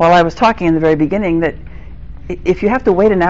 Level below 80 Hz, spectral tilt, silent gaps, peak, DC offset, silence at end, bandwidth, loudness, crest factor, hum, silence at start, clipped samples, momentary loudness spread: -32 dBFS; -5.5 dB/octave; none; -2 dBFS; 2%; 0 s; 7.8 kHz; -13 LUFS; 12 dB; none; 0 s; under 0.1%; 13 LU